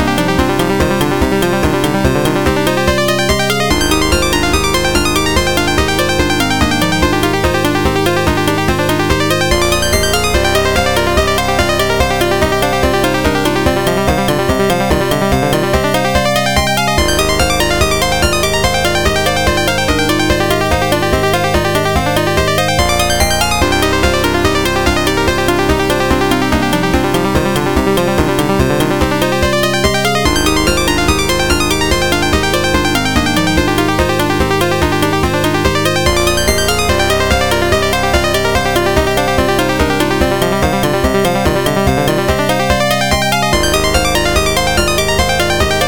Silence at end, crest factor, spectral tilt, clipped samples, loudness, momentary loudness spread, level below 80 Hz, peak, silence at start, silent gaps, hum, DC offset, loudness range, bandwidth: 0 s; 12 dB; -4 dB/octave; under 0.1%; -12 LUFS; 1 LU; -24 dBFS; 0 dBFS; 0 s; none; none; 4%; 1 LU; 18 kHz